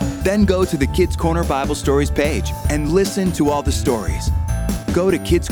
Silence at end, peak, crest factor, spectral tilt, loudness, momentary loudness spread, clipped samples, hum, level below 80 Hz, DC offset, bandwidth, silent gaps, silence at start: 0 s; -2 dBFS; 16 dB; -6 dB/octave; -18 LUFS; 5 LU; under 0.1%; none; -24 dBFS; under 0.1%; 19 kHz; none; 0 s